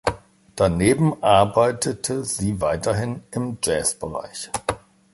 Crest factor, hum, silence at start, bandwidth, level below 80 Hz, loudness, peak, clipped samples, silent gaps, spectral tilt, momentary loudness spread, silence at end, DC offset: 20 dB; none; 0.05 s; 12 kHz; -44 dBFS; -22 LUFS; -2 dBFS; under 0.1%; none; -5 dB/octave; 13 LU; 0.35 s; under 0.1%